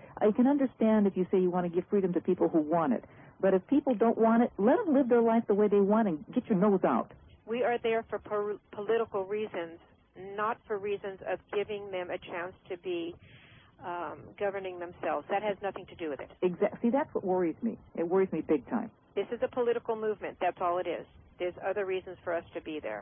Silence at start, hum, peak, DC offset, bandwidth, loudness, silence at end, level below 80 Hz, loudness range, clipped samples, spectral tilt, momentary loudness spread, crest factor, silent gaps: 0 s; none; -12 dBFS; under 0.1%; 3.6 kHz; -31 LUFS; 0 s; -66 dBFS; 10 LU; under 0.1%; -11 dB/octave; 13 LU; 18 dB; none